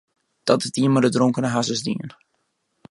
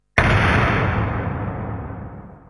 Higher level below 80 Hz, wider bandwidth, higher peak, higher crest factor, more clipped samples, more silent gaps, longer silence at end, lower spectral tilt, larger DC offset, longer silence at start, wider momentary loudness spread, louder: second, -66 dBFS vs -32 dBFS; about the same, 11.5 kHz vs 11 kHz; about the same, -2 dBFS vs -2 dBFS; about the same, 20 dB vs 18 dB; neither; neither; first, 0.8 s vs 0.1 s; about the same, -5.5 dB/octave vs -6.5 dB/octave; neither; first, 0.45 s vs 0.15 s; second, 11 LU vs 17 LU; about the same, -21 LUFS vs -20 LUFS